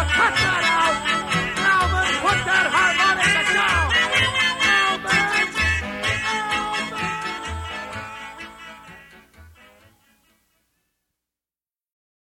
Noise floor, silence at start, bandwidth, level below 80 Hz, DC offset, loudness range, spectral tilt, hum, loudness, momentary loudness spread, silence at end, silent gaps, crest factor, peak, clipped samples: under -90 dBFS; 0 s; 16.5 kHz; -40 dBFS; under 0.1%; 16 LU; -2.5 dB/octave; none; -19 LUFS; 15 LU; 2.75 s; none; 16 dB; -6 dBFS; under 0.1%